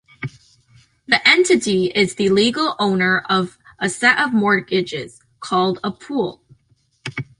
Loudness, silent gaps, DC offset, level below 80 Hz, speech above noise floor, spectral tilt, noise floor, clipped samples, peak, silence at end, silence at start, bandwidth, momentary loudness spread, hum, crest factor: -17 LUFS; none; under 0.1%; -58 dBFS; 43 dB; -4 dB/octave; -61 dBFS; under 0.1%; -2 dBFS; 0.15 s; 0.2 s; 11.5 kHz; 17 LU; none; 18 dB